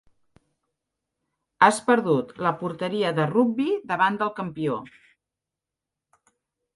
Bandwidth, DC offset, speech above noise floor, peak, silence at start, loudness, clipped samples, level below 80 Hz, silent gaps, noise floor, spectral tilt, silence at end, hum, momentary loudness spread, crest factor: 11.5 kHz; under 0.1%; 64 dB; -2 dBFS; 1.6 s; -23 LUFS; under 0.1%; -68 dBFS; none; -87 dBFS; -5.5 dB/octave; 1.9 s; none; 9 LU; 24 dB